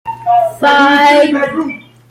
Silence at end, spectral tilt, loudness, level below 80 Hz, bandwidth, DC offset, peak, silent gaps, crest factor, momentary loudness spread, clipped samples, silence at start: 0.3 s; -4 dB/octave; -10 LUFS; -56 dBFS; 16 kHz; under 0.1%; 0 dBFS; none; 10 dB; 13 LU; under 0.1%; 0.05 s